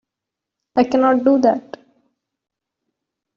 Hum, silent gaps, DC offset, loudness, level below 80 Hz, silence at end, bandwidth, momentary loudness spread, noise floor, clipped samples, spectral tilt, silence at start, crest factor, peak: none; none; under 0.1%; -16 LUFS; -62 dBFS; 1.75 s; 7 kHz; 9 LU; -84 dBFS; under 0.1%; -4.5 dB/octave; 0.75 s; 18 dB; -4 dBFS